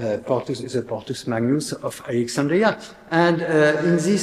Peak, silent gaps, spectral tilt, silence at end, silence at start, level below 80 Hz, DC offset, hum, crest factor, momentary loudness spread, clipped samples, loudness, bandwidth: -2 dBFS; none; -5.5 dB/octave; 0 s; 0 s; -60 dBFS; under 0.1%; none; 20 dB; 11 LU; under 0.1%; -21 LUFS; 14.5 kHz